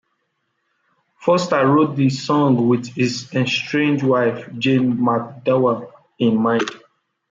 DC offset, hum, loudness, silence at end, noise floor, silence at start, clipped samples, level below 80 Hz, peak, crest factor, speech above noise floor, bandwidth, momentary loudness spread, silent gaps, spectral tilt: under 0.1%; none; -18 LUFS; 0.55 s; -71 dBFS; 1.2 s; under 0.1%; -64 dBFS; -4 dBFS; 14 dB; 54 dB; 7.8 kHz; 6 LU; none; -6.5 dB/octave